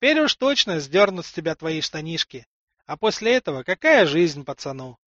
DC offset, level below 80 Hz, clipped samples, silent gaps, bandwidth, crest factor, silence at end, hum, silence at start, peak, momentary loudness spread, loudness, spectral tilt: under 0.1%; -62 dBFS; under 0.1%; 2.46-2.68 s; 8 kHz; 18 dB; 0.15 s; none; 0 s; -4 dBFS; 14 LU; -21 LUFS; -4 dB/octave